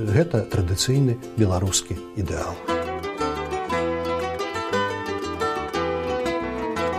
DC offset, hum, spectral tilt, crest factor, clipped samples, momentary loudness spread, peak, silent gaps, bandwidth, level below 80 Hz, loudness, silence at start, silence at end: under 0.1%; none; -5 dB/octave; 18 dB; under 0.1%; 7 LU; -6 dBFS; none; 15.5 kHz; -42 dBFS; -25 LUFS; 0 s; 0 s